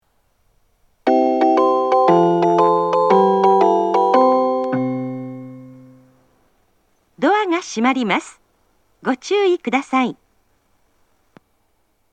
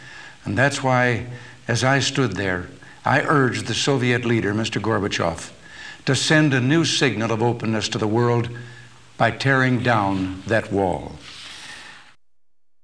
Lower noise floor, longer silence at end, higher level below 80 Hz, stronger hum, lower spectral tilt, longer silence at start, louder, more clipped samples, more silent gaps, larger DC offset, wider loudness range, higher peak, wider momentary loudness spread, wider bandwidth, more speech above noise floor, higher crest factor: second, -65 dBFS vs -77 dBFS; first, 2 s vs 0.85 s; second, -66 dBFS vs -52 dBFS; neither; about the same, -6 dB/octave vs -5 dB/octave; first, 1.05 s vs 0 s; first, -17 LUFS vs -20 LUFS; neither; neither; second, under 0.1% vs 0.3%; first, 8 LU vs 2 LU; about the same, 0 dBFS vs -2 dBFS; second, 10 LU vs 18 LU; second, 9.2 kHz vs 11 kHz; second, 47 dB vs 57 dB; about the same, 18 dB vs 20 dB